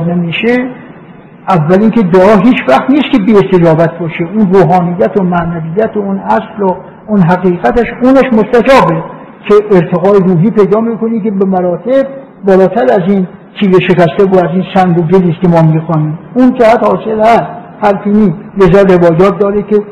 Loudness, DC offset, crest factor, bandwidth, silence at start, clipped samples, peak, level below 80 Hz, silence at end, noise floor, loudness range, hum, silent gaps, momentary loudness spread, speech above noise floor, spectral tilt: -8 LUFS; 0.3%; 8 dB; 9 kHz; 0 s; 1%; 0 dBFS; -36 dBFS; 0 s; -33 dBFS; 3 LU; none; none; 8 LU; 25 dB; -8.5 dB/octave